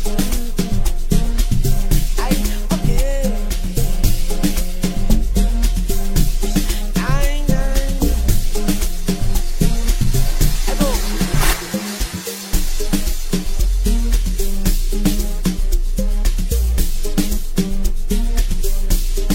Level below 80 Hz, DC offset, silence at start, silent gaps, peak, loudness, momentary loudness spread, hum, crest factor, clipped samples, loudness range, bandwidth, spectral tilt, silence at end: -16 dBFS; under 0.1%; 0 s; none; 0 dBFS; -21 LUFS; 4 LU; none; 14 dB; under 0.1%; 1 LU; 16.5 kHz; -5 dB/octave; 0 s